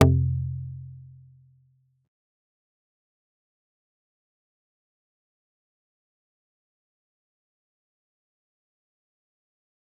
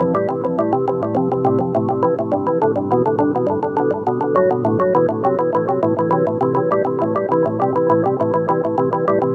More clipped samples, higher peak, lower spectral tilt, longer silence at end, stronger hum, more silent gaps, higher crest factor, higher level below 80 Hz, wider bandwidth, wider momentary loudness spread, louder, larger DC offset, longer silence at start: neither; about the same, -2 dBFS vs -2 dBFS; second, -7.5 dB/octave vs -10.5 dB/octave; first, 8.95 s vs 0 s; neither; neither; first, 32 dB vs 14 dB; about the same, -54 dBFS vs -58 dBFS; second, 0.7 kHz vs 6 kHz; first, 25 LU vs 3 LU; second, -27 LUFS vs -18 LUFS; neither; about the same, 0 s vs 0 s